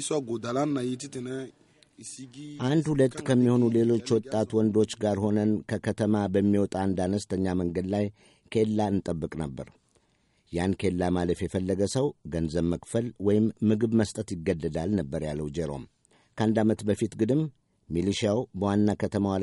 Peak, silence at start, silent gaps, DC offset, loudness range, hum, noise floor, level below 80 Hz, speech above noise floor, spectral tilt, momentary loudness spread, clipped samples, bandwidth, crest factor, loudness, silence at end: -12 dBFS; 0 s; none; under 0.1%; 5 LU; none; -68 dBFS; -54 dBFS; 42 dB; -6.5 dB/octave; 11 LU; under 0.1%; 11.5 kHz; 16 dB; -27 LUFS; 0 s